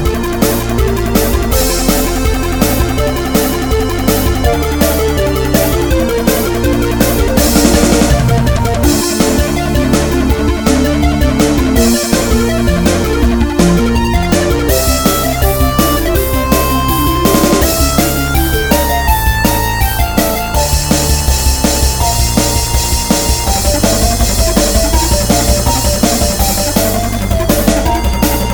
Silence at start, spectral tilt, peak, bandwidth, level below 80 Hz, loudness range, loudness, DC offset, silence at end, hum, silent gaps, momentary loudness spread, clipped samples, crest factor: 0 s; -4.5 dB/octave; 0 dBFS; over 20 kHz; -16 dBFS; 2 LU; -12 LUFS; under 0.1%; 0 s; none; none; 3 LU; under 0.1%; 10 dB